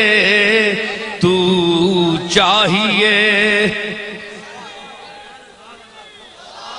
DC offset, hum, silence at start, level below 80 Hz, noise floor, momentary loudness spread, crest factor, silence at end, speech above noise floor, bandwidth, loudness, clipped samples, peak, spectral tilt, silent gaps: under 0.1%; none; 0 s; -50 dBFS; -40 dBFS; 22 LU; 16 dB; 0 s; 27 dB; 10.5 kHz; -13 LUFS; under 0.1%; 0 dBFS; -4 dB/octave; none